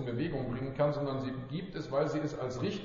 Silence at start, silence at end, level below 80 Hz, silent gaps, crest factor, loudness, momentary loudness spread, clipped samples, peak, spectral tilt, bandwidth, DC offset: 0 s; 0 s; -54 dBFS; none; 16 dB; -35 LUFS; 7 LU; under 0.1%; -18 dBFS; -6.5 dB/octave; 7.4 kHz; under 0.1%